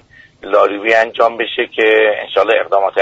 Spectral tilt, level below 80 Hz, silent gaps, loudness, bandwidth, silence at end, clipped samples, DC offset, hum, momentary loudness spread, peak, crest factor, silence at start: -3.5 dB/octave; -58 dBFS; none; -13 LUFS; 8 kHz; 0 s; under 0.1%; under 0.1%; none; 6 LU; 0 dBFS; 14 dB; 0.45 s